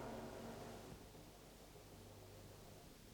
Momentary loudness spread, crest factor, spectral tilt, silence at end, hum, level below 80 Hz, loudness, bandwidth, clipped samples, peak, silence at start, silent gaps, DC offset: 8 LU; 18 dB; -5 dB/octave; 0 s; 50 Hz at -65 dBFS; -68 dBFS; -57 LUFS; over 20 kHz; under 0.1%; -38 dBFS; 0 s; none; under 0.1%